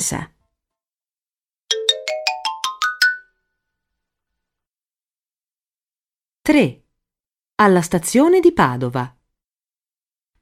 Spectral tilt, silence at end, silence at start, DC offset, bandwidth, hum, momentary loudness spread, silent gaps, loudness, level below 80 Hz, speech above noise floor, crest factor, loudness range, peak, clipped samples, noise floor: -4 dB/octave; 1.35 s; 0 s; under 0.1%; 16.5 kHz; none; 14 LU; none; -17 LUFS; -52 dBFS; over 75 dB; 20 dB; 8 LU; 0 dBFS; under 0.1%; under -90 dBFS